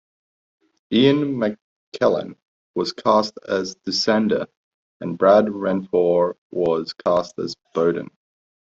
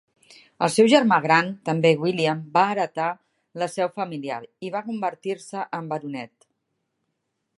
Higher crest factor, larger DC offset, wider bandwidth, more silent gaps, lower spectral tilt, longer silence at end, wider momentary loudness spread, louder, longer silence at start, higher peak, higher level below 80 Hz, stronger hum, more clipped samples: about the same, 18 dB vs 22 dB; neither; second, 7.8 kHz vs 11.5 kHz; first, 1.62-1.92 s, 2.42-2.74 s, 4.57-5.00 s, 6.38-6.50 s vs none; about the same, -5.5 dB/octave vs -5 dB/octave; second, 0.65 s vs 1.3 s; about the same, 14 LU vs 15 LU; about the same, -21 LUFS vs -23 LUFS; first, 0.9 s vs 0.6 s; about the same, -4 dBFS vs -2 dBFS; first, -62 dBFS vs -74 dBFS; neither; neither